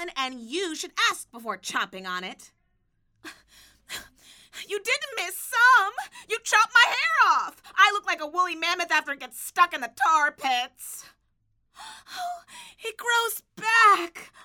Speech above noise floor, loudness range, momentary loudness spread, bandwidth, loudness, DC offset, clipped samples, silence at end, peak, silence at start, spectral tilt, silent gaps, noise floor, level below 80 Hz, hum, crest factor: 45 dB; 13 LU; 20 LU; 20 kHz; -23 LUFS; under 0.1%; under 0.1%; 0.2 s; -4 dBFS; 0 s; 0 dB/octave; none; -70 dBFS; -70 dBFS; none; 22 dB